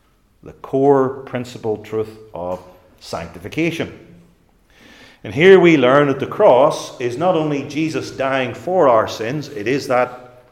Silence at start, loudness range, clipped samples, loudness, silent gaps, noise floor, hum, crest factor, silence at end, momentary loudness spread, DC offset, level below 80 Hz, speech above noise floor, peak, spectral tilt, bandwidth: 0.45 s; 12 LU; under 0.1%; -17 LUFS; none; -54 dBFS; none; 18 dB; 0.25 s; 17 LU; under 0.1%; -56 dBFS; 37 dB; 0 dBFS; -6 dB/octave; 13.5 kHz